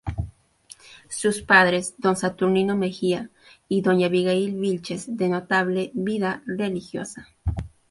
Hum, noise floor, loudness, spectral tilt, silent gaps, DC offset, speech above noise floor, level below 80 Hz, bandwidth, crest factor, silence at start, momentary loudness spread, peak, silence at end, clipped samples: none; -51 dBFS; -23 LUFS; -5 dB/octave; none; under 0.1%; 28 dB; -44 dBFS; 11.5 kHz; 22 dB; 0.05 s; 15 LU; -2 dBFS; 0.25 s; under 0.1%